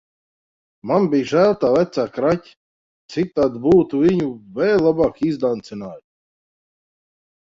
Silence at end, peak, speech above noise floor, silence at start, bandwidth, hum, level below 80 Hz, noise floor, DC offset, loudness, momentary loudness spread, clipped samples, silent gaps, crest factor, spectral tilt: 1.4 s; -2 dBFS; over 72 dB; 0.85 s; 7.6 kHz; none; -52 dBFS; under -90 dBFS; under 0.1%; -18 LUFS; 12 LU; under 0.1%; 2.57-3.09 s; 18 dB; -7.5 dB/octave